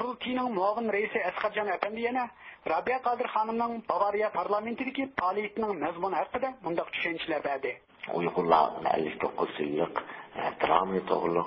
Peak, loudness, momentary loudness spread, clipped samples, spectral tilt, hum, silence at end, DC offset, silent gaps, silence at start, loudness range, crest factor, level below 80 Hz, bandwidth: -8 dBFS; -30 LUFS; 7 LU; under 0.1%; -3 dB/octave; none; 0 s; under 0.1%; none; 0 s; 3 LU; 22 dB; -66 dBFS; 5.6 kHz